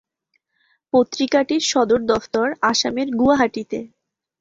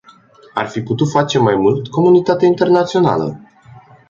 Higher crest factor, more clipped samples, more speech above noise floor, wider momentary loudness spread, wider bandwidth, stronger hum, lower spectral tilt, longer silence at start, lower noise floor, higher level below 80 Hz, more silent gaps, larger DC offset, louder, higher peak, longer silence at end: about the same, 18 dB vs 14 dB; neither; first, 52 dB vs 31 dB; second, 5 LU vs 10 LU; about the same, 7.8 kHz vs 7.6 kHz; neither; second, -3 dB/octave vs -7 dB/octave; first, 0.95 s vs 0.55 s; first, -71 dBFS vs -45 dBFS; about the same, -54 dBFS vs -52 dBFS; neither; neither; second, -19 LUFS vs -14 LUFS; about the same, -2 dBFS vs 0 dBFS; second, 0.55 s vs 0.7 s